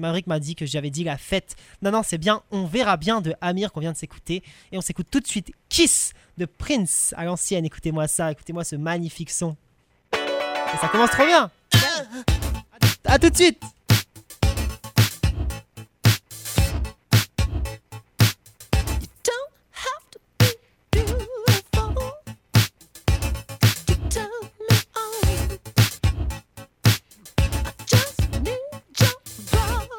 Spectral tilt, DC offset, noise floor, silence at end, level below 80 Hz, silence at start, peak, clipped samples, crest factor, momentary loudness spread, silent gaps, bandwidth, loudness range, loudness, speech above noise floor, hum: -4.5 dB/octave; under 0.1%; -42 dBFS; 0 s; -32 dBFS; 0 s; -2 dBFS; under 0.1%; 20 dB; 13 LU; none; 18.5 kHz; 5 LU; -23 LUFS; 20 dB; none